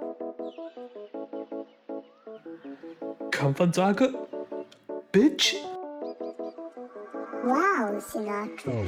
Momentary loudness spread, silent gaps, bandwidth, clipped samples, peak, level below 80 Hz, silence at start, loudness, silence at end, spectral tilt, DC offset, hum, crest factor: 19 LU; none; 19.5 kHz; under 0.1%; -10 dBFS; -70 dBFS; 0 s; -28 LUFS; 0 s; -5 dB/octave; under 0.1%; none; 20 dB